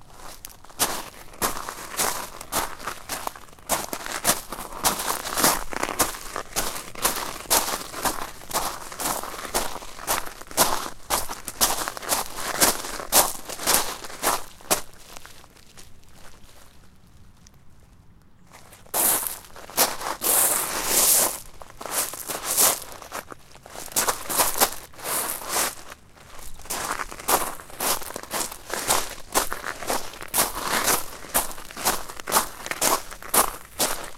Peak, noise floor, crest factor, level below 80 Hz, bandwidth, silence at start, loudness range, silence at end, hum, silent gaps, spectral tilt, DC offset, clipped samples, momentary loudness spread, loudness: -2 dBFS; -50 dBFS; 26 dB; -44 dBFS; 17 kHz; 0 s; 7 LU; 0 s; none; none; -0.5 dB/octave; under 0.1%; under 0.1%; 15 LU; -24 LUFS